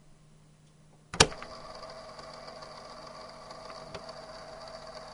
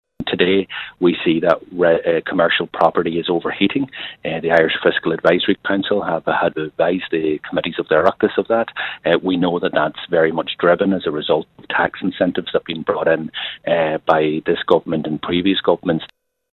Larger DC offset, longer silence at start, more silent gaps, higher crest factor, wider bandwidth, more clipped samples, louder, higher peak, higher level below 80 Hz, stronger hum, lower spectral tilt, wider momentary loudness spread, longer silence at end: neither; second, 0 s vs 0.2 s; neither; first, 36 dB vs 18 dB; first, over 20 kHz vs 6 kHz; neither; second, -33 LUFS vs -18 LUFS; about the same, -2 dBFS vs 0 dBFS; about the same, -54 dBFS vs -52 dBFS; neither; second, -2 dB/octave vs -7.5 dB/octave; first, 21 LU vs 6 LU; second, 0 s vs 0.5 s